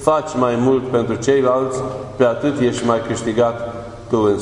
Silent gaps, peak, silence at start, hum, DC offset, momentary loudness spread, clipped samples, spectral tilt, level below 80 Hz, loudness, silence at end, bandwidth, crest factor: none; 0 dBFS; 0 s; none; under 0.1%; 9 LU; under 0.1%; -6 dB/octave; -46 dBFS; -18 LUFS; 0 s; 11 kHz; 18 dB